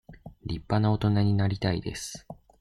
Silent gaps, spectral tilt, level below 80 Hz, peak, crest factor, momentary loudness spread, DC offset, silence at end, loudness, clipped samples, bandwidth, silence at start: none; -6.5 dB/octave; -48 dBFS; -10 dBFS; 18 dB; 14 LU; under 0.1%; 0.25 s; -27 LUFS; under 0.1%; 12.5 kHz; 0.1 s